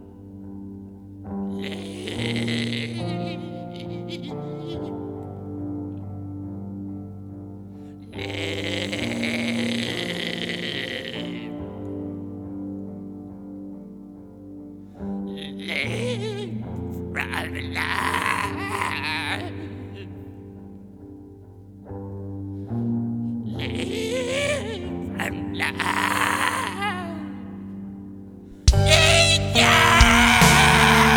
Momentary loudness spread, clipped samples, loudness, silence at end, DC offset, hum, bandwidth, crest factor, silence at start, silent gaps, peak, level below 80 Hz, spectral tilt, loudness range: 25 LU; under 0.1%; -22 LUFS; 0 s; under 0.1%; none; over 20 kHz; 24 dB; 0 s; none; 0 dBFS; -36 dBFS; -4 dB/octave; 15 LU